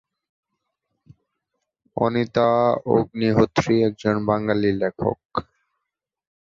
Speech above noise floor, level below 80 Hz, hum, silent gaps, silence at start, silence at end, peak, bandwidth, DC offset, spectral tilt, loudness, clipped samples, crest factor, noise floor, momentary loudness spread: 63 dB; -52 dBFS; none; 5.25-5.29 s; 1.95 s; 1.05 s; -2 dBFS; 7.6 kHz; under 0.1%; -7 dB/octave; -21 LUFS; under 0.1%; 20 dB; -83 dBFS; 9 LU